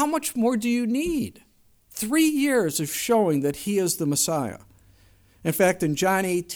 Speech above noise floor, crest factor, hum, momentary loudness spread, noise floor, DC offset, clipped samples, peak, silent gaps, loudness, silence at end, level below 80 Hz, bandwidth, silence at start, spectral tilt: 33 dB; 16 dB; none; 8 LU; -57 dBFS; under 0.1%; under 0.1%; -8 dBFS; none; -23 LUFS; 0 s; -56 dBFS; over 20 kHz; 0 s; -4 dB/octave